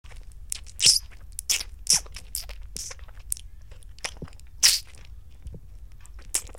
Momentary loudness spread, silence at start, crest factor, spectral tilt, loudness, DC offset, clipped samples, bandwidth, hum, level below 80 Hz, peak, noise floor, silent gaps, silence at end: 25 LU; 0.05 s; 26 dB; 1 dB/octave; -24 LUFS; 0.5%; under 0.1%; 17 kHz; none; -44 dBFS; -2 dBFS; -45 dBFS; none; 0 s